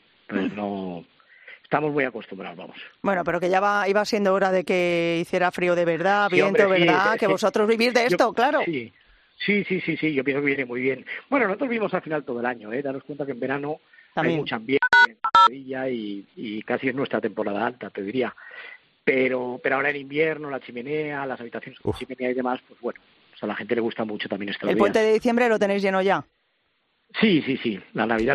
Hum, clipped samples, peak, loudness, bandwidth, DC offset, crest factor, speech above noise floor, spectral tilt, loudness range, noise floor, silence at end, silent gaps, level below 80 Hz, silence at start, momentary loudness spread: none; under 0.1%; -2 dBFS; -23 LUFS; 13 kHz; under 0.1%; 22 dB; 47 dB; -5.5 dB/octave; 8 LU; -70 dBFS; 0 s; none; -62 dBFS; 0.3 s; 14 LU